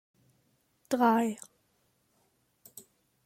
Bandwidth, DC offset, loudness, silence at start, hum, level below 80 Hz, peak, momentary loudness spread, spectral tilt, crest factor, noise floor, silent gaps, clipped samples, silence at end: 16 kHz; under 0.1%; -28 LUFS; 0.9 s; none; -82 dBFS; -12 dBFS; 26 LU; -5 dB/octave; 22 dB; -73 dBFS; none; under 0.1%; 1.9 s